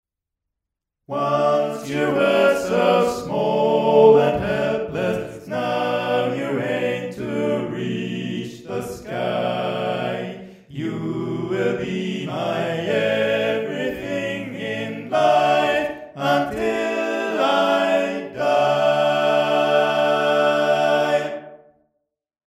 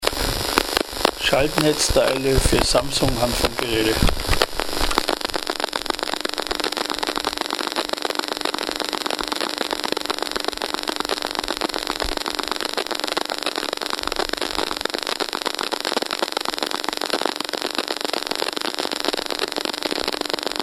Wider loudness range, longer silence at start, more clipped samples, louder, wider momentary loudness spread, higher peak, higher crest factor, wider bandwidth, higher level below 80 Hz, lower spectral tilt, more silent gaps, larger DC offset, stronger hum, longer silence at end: first, 8 LU vs 5 LU; first, 1.1 s vs 0 s; neither; about the same, -21 LUFS vs -22 LUFS; first, 11 LU vs 6 LU; about the same, -2 dBFS vs 0 dBFS; about the same, 18 dB vs 22 dB; second, 15 kHz vs 17.5 kHz; second, -56 dBFS vs -34 dBFS; first, -5.5 dB/octave vs -3 dB/octave; neither; neither; neither; first, 0.95 s vs 0 s